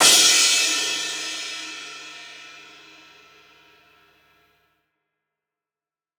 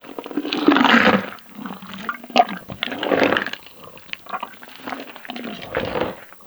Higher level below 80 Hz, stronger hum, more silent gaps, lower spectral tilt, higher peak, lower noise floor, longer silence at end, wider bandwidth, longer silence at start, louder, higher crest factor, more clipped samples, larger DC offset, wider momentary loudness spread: second, -80 dBFS vs -56 dBFS; neither; neither; second, 2 dB/octave vs -5 dB/octave; about the same, -2 dBFS vs 0 dBFS; first, under -90 dBFS vs -42 dBFS; first, 3.6 s vs 0 s; about the same, over 20 kHz vs over 20 kHz; about the same, 0 s vs 0.05 s; first, -17 LUFS vs -20 LUFS; about the same, 24 dB vs 22 dB; neither; neither; first, 27 LU vs 20 LU